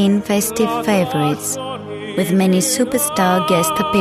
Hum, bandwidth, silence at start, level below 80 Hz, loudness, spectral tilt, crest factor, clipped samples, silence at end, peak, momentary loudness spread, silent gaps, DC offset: none; 14 kHz; 0 s; -50 dBFS; -17 LUFS; -4.5 dB/octave; 14 dB; under 0.1%; 0 s; -2 dBFS; 8 LU; none; under 0.1%